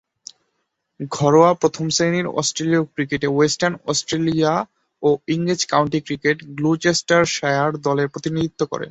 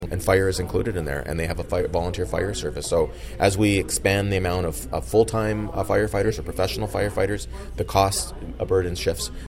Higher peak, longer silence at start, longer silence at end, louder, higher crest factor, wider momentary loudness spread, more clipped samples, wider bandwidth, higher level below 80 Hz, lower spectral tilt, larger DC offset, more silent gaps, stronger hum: about the same, -2 dBFS vs -4 dBFS; first, 1 s vs 0 s; about the same, 0 s vs 0 s; first, -19 LUFS vs -24 LUFS; about the same, 18 dB vs 18 dB; about the same, 7 LU vs 7 LU; neither; second, 8.2 kHz vs 16.5 kHz; second, -56 dBFS vs -36 dBFS; about the same, -4.5 dB/octave vs -5 dB/octave; neither; neither; neither